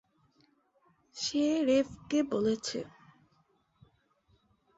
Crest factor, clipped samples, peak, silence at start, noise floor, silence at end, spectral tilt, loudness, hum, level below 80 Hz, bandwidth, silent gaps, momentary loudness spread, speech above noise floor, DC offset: 18 dB; under 0.1%; -18 dBFS; 1.15 s; -71 dBFS; 1.9 s; -4 dB/octave; -31 LUFS; none; -68 dBFS; 8 kHz; none; 13 LU; 41 dB; under 0.1%